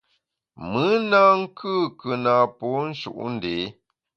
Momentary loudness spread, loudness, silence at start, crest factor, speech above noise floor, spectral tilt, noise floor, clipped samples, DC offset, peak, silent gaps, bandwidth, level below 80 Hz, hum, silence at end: 14 LU; -22 LUFS; 0.6 s; 18 dB; 50 dB; -7 dB/octave; -72 dBFS; under 0.1%; under 0.1%; -4 dBFS; none; 7 kHz; -60 dBFS; none; 0.45 s